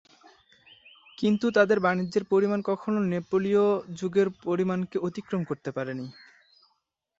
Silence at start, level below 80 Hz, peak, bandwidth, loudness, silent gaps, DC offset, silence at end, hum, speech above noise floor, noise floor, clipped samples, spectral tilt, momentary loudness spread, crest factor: 1.2 s; -68 dBFS; -8 dBFS; 7.8 kHz; -26 LUFS; none; under 0.1%; 1.1 s; none; 50 dB; -75 dBFS; under 0.1%; -7 dB/octave; 10 LU; 20 dB